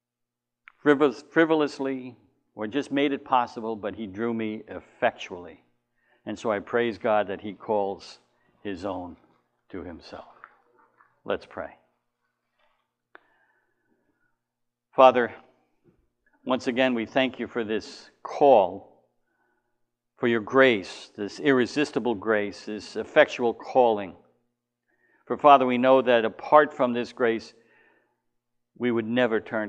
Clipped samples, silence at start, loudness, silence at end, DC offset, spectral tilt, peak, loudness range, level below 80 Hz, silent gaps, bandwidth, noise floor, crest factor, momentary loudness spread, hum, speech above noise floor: under 0.1%; 0.85 s; -24 LUFS; 0 s; under 0.1%; -5.5 dB/octave; -2 dBFS; 18 LU; -68 dBFS; none; 9.2 kHz; -85 dBFS; 24 dB; 20 LU; none; 61 dB